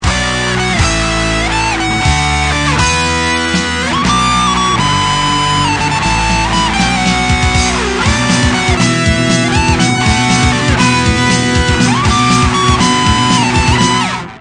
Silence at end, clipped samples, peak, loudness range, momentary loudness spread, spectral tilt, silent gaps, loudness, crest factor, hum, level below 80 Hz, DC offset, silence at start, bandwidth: 0 s; under 0.1%; 0 dBFS; 2 LU; 3 LU; -4 dB/octave; none; -11 LUFS; 12 dB; none; -22 dBFS; under 0.1%; 0 s; 10 kHz